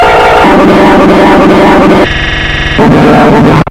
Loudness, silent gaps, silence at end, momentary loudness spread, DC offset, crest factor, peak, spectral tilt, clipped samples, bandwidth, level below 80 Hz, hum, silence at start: -4 LUFS; none; 0 s; 5 LU; 1%; 4 dB; 0 dBFS; -6.5 dB/octave; 10%; 16.5 kHz; -20 dBFS; none; 0 s